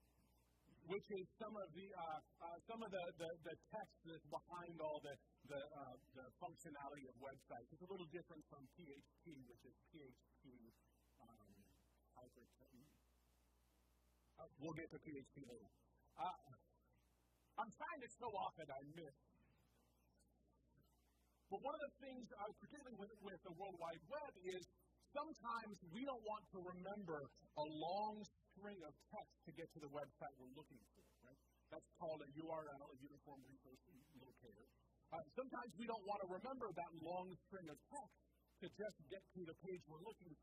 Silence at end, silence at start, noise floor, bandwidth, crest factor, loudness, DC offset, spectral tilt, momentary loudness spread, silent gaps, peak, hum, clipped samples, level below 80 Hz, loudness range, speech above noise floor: 0 s; 0 s; -81 dBFS; 15 kHz; 20 dB; -54 LUFS; under 0.1%; -5.5 dB/octave; 15 LU; none; -34 dBFS; none; under 0.1%; -82 dBFS; 8 LU; 26 dB